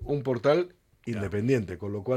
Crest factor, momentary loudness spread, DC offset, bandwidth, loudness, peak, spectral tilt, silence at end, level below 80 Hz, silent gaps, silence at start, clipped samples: 16 dB; 12 LU; under 0.1%; 13 kHz; -28 LUFS; -12 dBFS; -7.5 dB/octave; 0 s; -52 dBFS; none; 0 s; under 0.1%